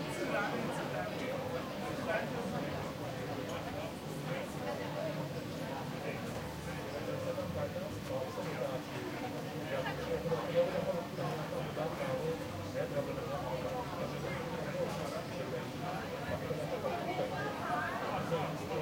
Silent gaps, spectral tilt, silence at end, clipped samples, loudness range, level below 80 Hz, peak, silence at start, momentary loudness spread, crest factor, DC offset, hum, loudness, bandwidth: none; -5.5 dB/octave; 0 s; under 0.1%; 3 LU; -62 dBFS; -20 dBFS; 0 s; 5 LU; 18 dB; under 0.1%; none; -38 LUFS; 16.5 kHz